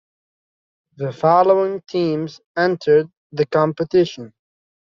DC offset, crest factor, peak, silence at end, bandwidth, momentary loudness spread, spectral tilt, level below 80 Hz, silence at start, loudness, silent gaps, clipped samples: under 0.1%; 18 dB; -2 dBFS; 0.55 s; 7.2 kHz; 13 LU; -5.5 dB/octave; -62 dBFS; 1 s; -18 LUFS; 2.46-2.55 s, 3.17-3.30 s; under 0.1%